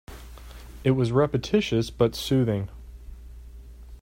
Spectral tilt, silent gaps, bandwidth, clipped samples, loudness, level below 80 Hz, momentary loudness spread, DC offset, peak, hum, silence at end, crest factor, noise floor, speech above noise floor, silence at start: -6.5 dB/octave; none; 16 kHz; under 0.1%; -24 LUFS; -44 dBFS; 23 LU; under 0.1%; -8 dBFS; none; 0 s; 18 dB; -43 dBFS; 20 dB; 0.1 s